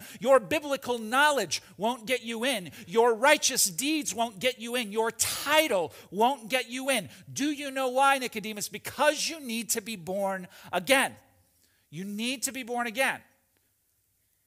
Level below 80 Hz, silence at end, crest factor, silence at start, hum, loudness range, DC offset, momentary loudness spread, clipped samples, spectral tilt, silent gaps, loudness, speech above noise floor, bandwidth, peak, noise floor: -72 dBFS; 1.25 s; 20 dB; 0 s; none; 5 LU; under 0.1%; 10 LU; under 0.1%; -2 dB/octave; none; -27 LUFS; 44 dB; 16 kHz; -8 dBFS; -72 dBFS